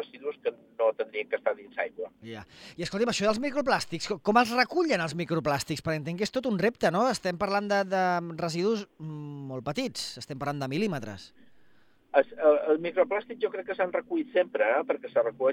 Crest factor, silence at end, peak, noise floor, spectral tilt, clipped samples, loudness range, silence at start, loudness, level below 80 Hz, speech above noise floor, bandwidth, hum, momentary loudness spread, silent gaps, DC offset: 22 dB; 0 s; -6 dBFS; -63 dBFS; -5 dB/octave; under 0.1%; 5 LU; 0 s; -28 LUFS; -64 dBFS; 35 dB; 16.5 kHz; none; 12 LU; none; under 0.1%